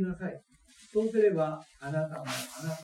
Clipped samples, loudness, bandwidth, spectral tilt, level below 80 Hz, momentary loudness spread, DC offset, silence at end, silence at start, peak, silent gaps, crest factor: under 0.1%; -32 LUFS; 16 kHz; -6 dB/octave; -64 dBFS; 14 LU; under 0.1%; 0 s; 0 s; -16 dBFS; none; 16 dB